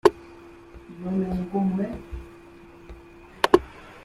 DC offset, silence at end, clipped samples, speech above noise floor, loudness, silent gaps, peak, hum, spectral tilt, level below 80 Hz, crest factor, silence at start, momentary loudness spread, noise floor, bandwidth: under 0.1%; 0 s; under 0.1%; 21 dB; -25 LUFS; none; -2 dBFS; none; -6.5 dB/octave; -46 dBFS; 26 dB; 0.05 s; 26 LU; -47 dBFS; 14.5 kHz